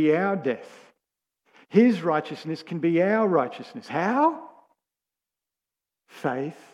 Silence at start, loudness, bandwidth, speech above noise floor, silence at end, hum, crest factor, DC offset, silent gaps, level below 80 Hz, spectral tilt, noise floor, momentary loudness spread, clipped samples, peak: 0 s; -24 LUFS; 11 kHz; 65 dB; 0.2 s; none; 20 dB; under 0.1%; none; -80 dBFS; -7.5 dB/octave; -89 dBFS; 13 LU; under 0.1%; -6 dBFS